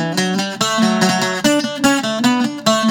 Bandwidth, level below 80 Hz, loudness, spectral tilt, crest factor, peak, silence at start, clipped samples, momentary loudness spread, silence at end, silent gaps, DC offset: 18.5 kHz; -56 dBFS; -16 LUFS; -3.5 dB/octave; 16 dB; 0 dBFS; 0 s; under 0.1%; 3 LU; 0 s; none; under 0.1%